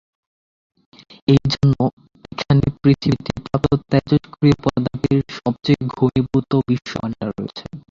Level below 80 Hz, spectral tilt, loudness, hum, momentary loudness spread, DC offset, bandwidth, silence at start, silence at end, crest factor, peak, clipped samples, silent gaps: -42 dBFS; -8 dB/octave; -19 LUFS; none; 10 LU; under 0.1%; 7.4 kHz; 1.3 s; 0.1 s; 18 dB; -2 dBFS; under 0.1%; 1.93-1.97 s